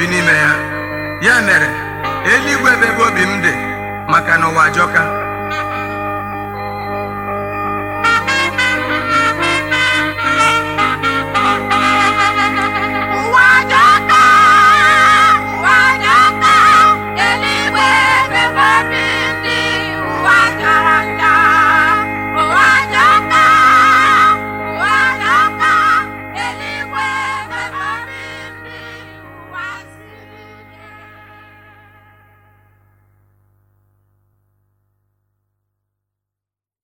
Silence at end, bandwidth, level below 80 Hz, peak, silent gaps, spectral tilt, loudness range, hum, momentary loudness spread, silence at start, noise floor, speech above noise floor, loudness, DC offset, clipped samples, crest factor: 5.85 s; 17 kHz; -44 dBFS; 0 dBFS; none; -3 dB/octave; 12 LU; 50 Hz at -45 dBFS; 14 LU; 0 s; -87 dBFS; 75 dB; -11 LUFS; under 0.1%; under 0.1%; 14 dB